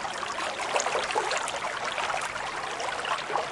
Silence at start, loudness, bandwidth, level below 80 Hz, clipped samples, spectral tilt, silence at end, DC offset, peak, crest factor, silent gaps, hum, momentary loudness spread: 0 s; -29 LUFS; 11.5 kHz; -62 dBFS; under 0.1%; -1 dB/octave; 0 s; under 0.1%; -10 dBFS; 20 dB; none; none; 5 LU